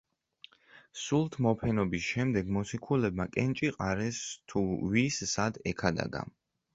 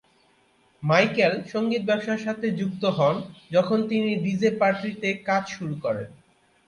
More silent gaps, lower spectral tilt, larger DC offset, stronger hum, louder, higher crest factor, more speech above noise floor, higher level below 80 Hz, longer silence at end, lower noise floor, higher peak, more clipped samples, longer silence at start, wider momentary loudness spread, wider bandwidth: neither; about the same, -5.5 dB/octave vs -6.5 dB/octave; neither; neither; second, -31 LUFS vs -24 LUFS; about the same, 22 dB vs 20 dB; second, 29 dB vs 38 dB; first, -54 dBFS vs -66 dBFS; about the same, 0.45 s vs 0.55 s; about the same, -59 dBFS vs -62 dBFS; second, -10 dBFS vs -4 dBFS; neither; about the same, 0.75 s vs 0.8 s; about the same, 8 LU vs 9 LU; second, 8 kHz vs 10.5 kHz